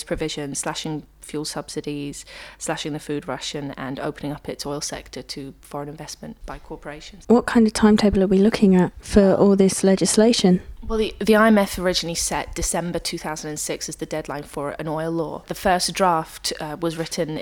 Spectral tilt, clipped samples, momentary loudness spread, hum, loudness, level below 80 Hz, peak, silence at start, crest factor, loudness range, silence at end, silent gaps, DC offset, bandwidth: -4.5 dB/octave; under 0.1%; 18 LU; none; -21 LUFS; -40 dBFS; -2 dBFS; 0 s; 18 dB; 12 LU; 0 s; none; under 0.1%; 18 kHz